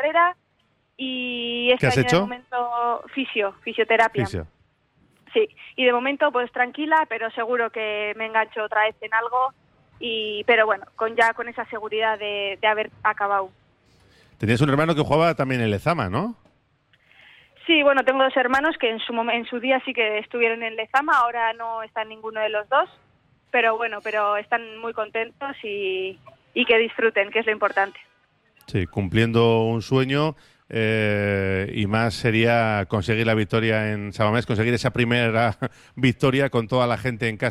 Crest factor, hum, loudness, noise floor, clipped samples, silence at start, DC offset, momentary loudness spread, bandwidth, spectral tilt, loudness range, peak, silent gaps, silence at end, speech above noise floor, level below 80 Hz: 16 dB; none; -22 LUFS; -66 dBFS; under 0.1%; 0 s; under 0.1%; 9 LU; 14 kHz; -6 dB/octave; 3 LU; -6 dBFS; none; 0 s; 44 dB; -54 dBFS